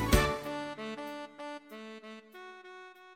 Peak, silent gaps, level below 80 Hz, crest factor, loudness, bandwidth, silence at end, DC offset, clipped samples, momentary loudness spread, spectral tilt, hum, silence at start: -10 dBFS; none; -40 dBFS; 26 dB; -36 LUFS; 16.5 kHz; 0 s; under 0.1%; under 0.1%; 20 LU; -4.5 dB/octave; none; 0 s